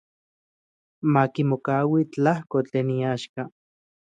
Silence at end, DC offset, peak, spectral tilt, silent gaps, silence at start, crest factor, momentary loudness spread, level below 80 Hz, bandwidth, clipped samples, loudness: 0.55 s; under 0.1%; -6 dBFS; -8 dB/octave; 3.29-3.34 s; 1.05 s; 18 dB; 10 LU; -68 dBFS; 9 kHz; under 0.1%; -24 LUFS